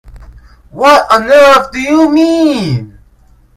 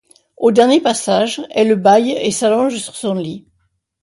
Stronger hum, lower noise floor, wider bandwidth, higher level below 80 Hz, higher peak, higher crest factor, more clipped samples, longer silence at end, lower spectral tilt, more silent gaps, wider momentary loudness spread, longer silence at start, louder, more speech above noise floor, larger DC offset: neither; second, -44 dBFS vs -65 dBFS; first, 15.5 kHz vs 11.5 kHz; first, -38 dBFS vs -60 dBFS; about the same, 0 dBFS vs 0 dBFS; second, 10 dB vs 16 dB; first, 1% vs under 0.1%; about the same, 0.7 s vs 0.65 s; about the same, -5.5 dB/octave vs -4.5 dB/octave; neither; about the same, 9 LU vs 11 LU; second, 0.15 s vs 0.4 s; first, -8 LUFS vs -15 LUFS; second, 37 dB vs 51 dB; neither